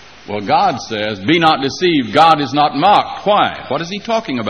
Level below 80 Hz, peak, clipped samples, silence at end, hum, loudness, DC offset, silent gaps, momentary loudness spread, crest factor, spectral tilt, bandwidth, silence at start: -52 dBFS; 0 dBFS; under 0.1%; 0 s; none; -14 LUFS; 0.3%; none; 10 LU; 14 dB; -5 dB/octave; 10.5 kHz; 0.25 s